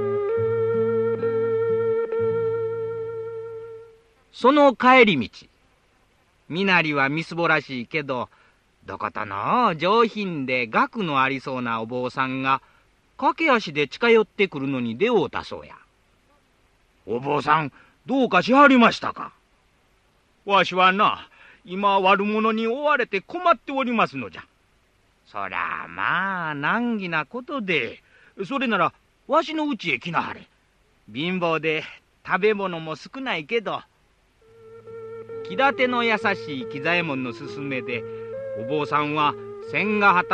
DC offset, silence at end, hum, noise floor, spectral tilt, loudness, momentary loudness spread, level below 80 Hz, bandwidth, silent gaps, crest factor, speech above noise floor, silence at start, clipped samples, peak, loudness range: under 0.1%; 0 s; none; -62 dBFS; -6 dB/octave; -22 LUFS; 16 LU; -62 dBFS; 8.6 kHz; none; 20 dB; 40 dB; 0 s; under 0.1%; -4 dBFS; 6 LU